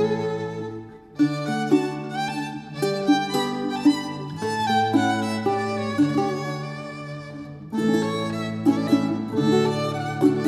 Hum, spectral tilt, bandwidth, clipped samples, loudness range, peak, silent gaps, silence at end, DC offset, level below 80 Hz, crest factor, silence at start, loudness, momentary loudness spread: none; -6 dB/octave; 13.5 kHz; under 0.1%; 2 LU; -6 dBFS; none; 0 s; under 0.1%; -62 dBFS; 18 dB; 0 s; -24 LUFS; 12 LU